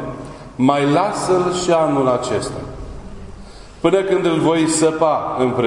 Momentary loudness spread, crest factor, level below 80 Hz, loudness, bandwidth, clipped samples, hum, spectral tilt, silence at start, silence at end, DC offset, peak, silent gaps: 19 LU; 16 dB; -42 dBFS; -17 LUFS; 11 kHz; under 0.1%; none; -5 dB/octave; 0 s; 0 s; under 0.1%; -2 dBFS; none